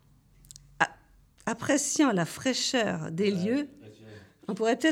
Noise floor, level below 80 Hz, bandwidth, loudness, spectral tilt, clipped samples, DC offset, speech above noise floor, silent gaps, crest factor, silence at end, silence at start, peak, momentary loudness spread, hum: -59 dBFS; -64 dBFS; 16.5 kHz; -28 LUFS; -3.5 dB/octave; under 0.1%; under 0.1%; 32 dB; none; 22 dB; 0 s; 0.8 s; -8 dBFS; 13 LU; none